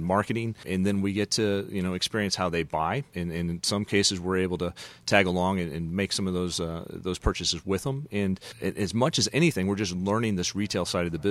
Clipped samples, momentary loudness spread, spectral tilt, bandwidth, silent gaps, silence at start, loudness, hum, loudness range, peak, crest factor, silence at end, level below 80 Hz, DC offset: under 0.1%; 8 LU; -4.5 dB/octave; 15 kHz; none; 0 s; -27 LUFS; none; 2 LU; -4 dBFS; 24 dB; 0 s; -48 dBFS; under 0.1%